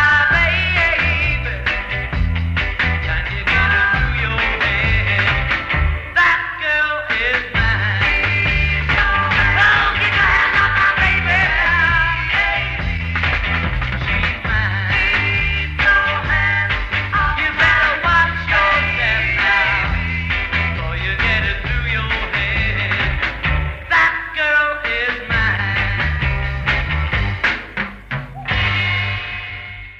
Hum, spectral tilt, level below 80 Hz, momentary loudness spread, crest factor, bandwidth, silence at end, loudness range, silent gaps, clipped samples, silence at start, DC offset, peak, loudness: none; -5.5 dB/octave; -26 dBFS; 7 LU; 16 dB; 8 kHz; 0 s; 5 LU; none; under 0.1%; 0 s; under 0.1%; -2 dBFS; -16 LUFS